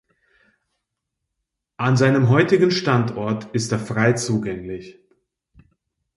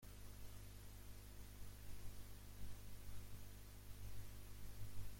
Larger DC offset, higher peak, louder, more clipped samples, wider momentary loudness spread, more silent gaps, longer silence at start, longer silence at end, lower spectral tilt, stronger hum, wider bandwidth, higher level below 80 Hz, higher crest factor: neither; first, -2 dBFS vs -34 dBFS; first, -19 LUFS vs -59 LUFS; neither; first, 12 LU vs 3 LU; neither; first, 1.8 s vs 0 s; first, 1.3 s vs 0 s; first, -6 dB/octave vs -4.5 dB/octave; second, none vs 50 Hz at -60 dBFS; second, 11.5 kHz vs 16.5 kHz; about the same, -56 dBFS vs -58 dBFS; about the same, 20 dB vs 16 dB